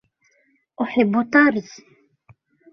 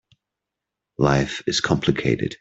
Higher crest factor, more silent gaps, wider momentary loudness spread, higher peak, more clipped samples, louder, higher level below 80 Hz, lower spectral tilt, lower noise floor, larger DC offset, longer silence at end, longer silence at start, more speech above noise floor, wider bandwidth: about the same, 20 dB vs 20 dB; neither; first, 13 LU vs 3 LU; about the same, -2 dBFS vs -2 dBFS; neither; about the same, -19 LUFS vs -21 LUFS; second, -64 dBFS vs -46 dBFS; first, -6.5 dB/octave vs -5 dB/octave; second, -64 dBFS vs -84 dBFS; neither; first, 1.1 s vs 0.05 s; second, 0.8 s vs 1 s; second, 45 dB vs 64 dB; second, 6.4 kHz vs 8 kHz